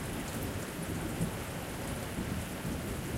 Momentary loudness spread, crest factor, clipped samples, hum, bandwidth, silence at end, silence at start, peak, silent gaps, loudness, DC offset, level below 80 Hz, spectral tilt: 2 LU; 18 dB; under 0.1%; none; 16 kHz; 0 s; 0 s; -18 dBFS; none; -37 LUFS; under 0.1%; -48 dBFS; -5 dB/octave